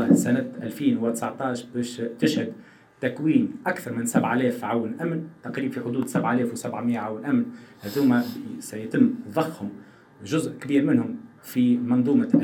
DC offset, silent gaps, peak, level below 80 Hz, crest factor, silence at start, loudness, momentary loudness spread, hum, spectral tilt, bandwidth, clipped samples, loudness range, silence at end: under 0.1%; none; -6 dBFS; -72 dBFS; 20 dB; 0 s; -25 LUFS; 12 LU; none; -6 dB/octave; 18.5 kHz; under 0.1%; 2 LU; 0 s